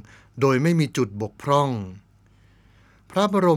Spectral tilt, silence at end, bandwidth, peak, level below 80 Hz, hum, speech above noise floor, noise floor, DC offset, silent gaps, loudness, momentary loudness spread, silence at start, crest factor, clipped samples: -6.5 dB/octave; 0 s; 15 kHz; -4 dBFS; -60 dBFS; none; 35 dB; -56 dBFS; under 0.1%; none; -23 LUFS; 12 LU; 0.35 s; 20 dB; under 0.1%